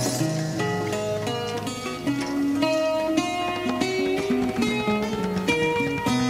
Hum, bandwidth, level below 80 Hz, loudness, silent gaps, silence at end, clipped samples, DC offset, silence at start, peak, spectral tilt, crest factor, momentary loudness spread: none; 16 kHz; -52 dBFS; -25 LUFS; none; 0 s; under 0.1%; under 0.1%; 0 s; -8 dBFS; -5 dB/octave; 18 dB; 5 LU